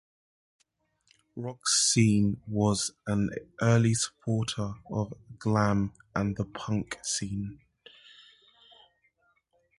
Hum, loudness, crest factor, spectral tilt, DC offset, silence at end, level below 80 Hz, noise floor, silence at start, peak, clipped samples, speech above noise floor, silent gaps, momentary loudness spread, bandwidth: none; -28 LUFS; 20 dB; -4.5 dB/octave; under 0.1%; 2.25 s; -54 dBFS; -73 dBFS; 1.35 s; -10 dBFS; under 0.1%; 44 dB; none; 12 LU; 11.5 kHz